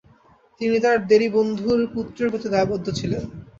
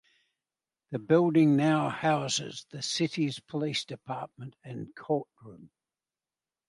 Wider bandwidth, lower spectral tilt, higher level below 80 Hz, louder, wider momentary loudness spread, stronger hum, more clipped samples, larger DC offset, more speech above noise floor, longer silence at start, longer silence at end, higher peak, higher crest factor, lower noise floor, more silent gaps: second, 7.6 kHz vs 11.5 kHz; about the same, -6 dB/octave vs -5 dB/octave; first, -50 dBFS vs -74 dBFS; first, -21 LUFS vs -28 LUFS; second, 10 LU vs 19 LU; neither; neither; neither; second, 34 dB vs over 61 dB; second, 0.6 s vs 0.9 s; second, 0.15 s vs 1 s; first, -4 dBFS vs -10 dBFS; about the same, 18 dB vs 20 dB; second, -55 dBFS vs under -90 dBFS; neither